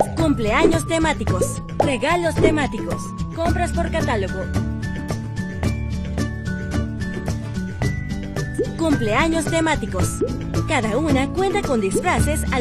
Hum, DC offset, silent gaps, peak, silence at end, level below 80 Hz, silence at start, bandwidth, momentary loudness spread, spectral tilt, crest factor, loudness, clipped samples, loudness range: none; under 0.1%; none; -2 dBFS; 0 s; -30 dBFS; 0 s; 14 kHz; 8 LU; -5.5 dB/octave; 18 dB; -21 LUFS; under 0.1%; 5 LU